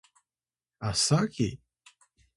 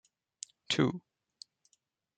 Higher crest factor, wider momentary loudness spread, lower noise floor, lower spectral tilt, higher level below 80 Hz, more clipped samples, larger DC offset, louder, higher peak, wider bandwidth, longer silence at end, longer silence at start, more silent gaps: about the same, 20 dB vs 24 dB; second, 13 LU vs 24 LU; first, under -90 dBFS vs -77 dBFS; about the same, -4 dB/octave vs -4.5 dB/octave; first, -56 dBFS vs -74 dBFS; neither; neither; first, -28 LUFS vs -32 LUFS; about the same, -12 dBFS vs -14 dBFS; first, 11.5 kHz vs 9.6 kHz; second, 0.8 s vs 1.2 s; about the same, 0.8 s vs 0.7 s; neither